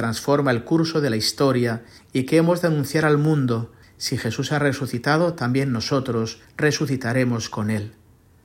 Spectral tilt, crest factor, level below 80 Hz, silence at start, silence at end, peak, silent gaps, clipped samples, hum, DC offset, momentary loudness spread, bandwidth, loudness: -5.5 dB/octave; 16 dB; -56 dBFS; 0 s; 0.55 s; -4 dBFS; none; under 0.1%; none; under 0.1%; 8 LU; 16.5 kHz; -22 LUFS